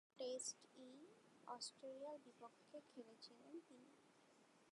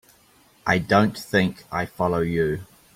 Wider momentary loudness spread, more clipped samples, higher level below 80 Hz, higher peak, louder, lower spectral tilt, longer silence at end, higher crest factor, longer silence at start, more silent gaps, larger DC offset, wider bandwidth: first, 16 LU vs 10 LU; neither; second, under -90 dBFS vs -50 dBFS; second, -38 dBFS vs -4 dBFS; second, -56 LUFS vs -23 LUFS; second, -1.5 dB/octave vs -6.5 dB/octave; second, 0 s vs 0.3 s; about the same, 20 dB vs 20 dB; second, 0.15 s vs 0.65 s; neither; neither; second, 11 kHz vs 16 kHz